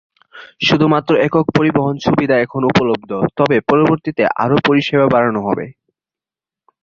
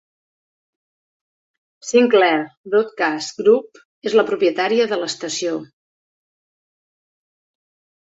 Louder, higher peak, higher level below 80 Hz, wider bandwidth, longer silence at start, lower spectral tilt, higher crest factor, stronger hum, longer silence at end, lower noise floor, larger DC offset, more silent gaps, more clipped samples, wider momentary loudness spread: first, -15 LUFS vs -18 LUFS; about the same, 0 dBFS vs -2 dBFS; first, -50 dBFS vs -70 dBFS; about the same, 7.4 kHz vs 8 kHz; second, 0.35 s vs 1.85 s; first, -7 dB/octave vs -3.5 dB/octave; about the same, 14 dB vs 18 dB; neither; second, 1.1 s vs 2.35 s; about the same, -89 dBFS vs under -90 dBFS; neither; second, none vs 2.57-2.64 s, 3.85-4.02 s; neither; second, 6 LU vs 9 LU